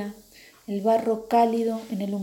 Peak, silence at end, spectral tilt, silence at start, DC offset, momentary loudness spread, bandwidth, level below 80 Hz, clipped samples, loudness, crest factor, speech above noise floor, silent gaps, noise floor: -8 dBFS; 0 s; -7 dB/octave; 0 s; under 0.1%; 13 LU; 17 kHz; -66 dBFS; under 0.1%; -24 LUFS; 18 dB; 28 dB; none; -51 dBFS